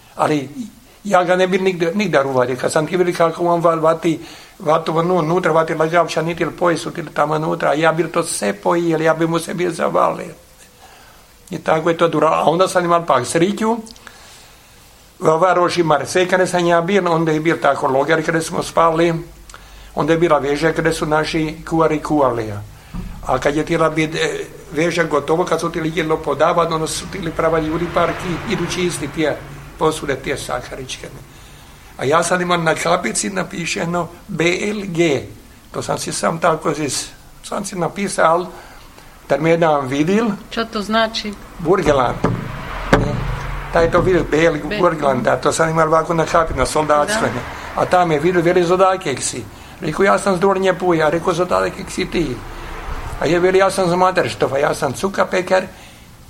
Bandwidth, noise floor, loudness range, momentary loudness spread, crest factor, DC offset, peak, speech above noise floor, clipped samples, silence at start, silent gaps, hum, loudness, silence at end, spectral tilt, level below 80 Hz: 16.5 kHz; -45 dBFS; 4 LU; 11 LU; 18 dB; under 0.1%; 0 dBFS; 28 dB; under 0.1%; 0.15 s; none; none; -17 LUFS; 0.1 s; -5 dB/octave; -38 dBFS